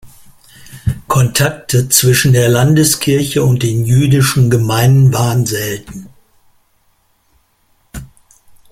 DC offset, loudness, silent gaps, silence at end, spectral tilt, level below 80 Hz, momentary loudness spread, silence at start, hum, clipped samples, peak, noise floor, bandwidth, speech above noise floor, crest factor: under 0.1%; -12 LUFS; none; 0.65 s; -5 dB/octave; -40 dBFS; 18 LU; 0.05 s; none; under 0.1%; 0 dBFS; -57 dBFS; 16.5 kHz; 46 dB; 14 dB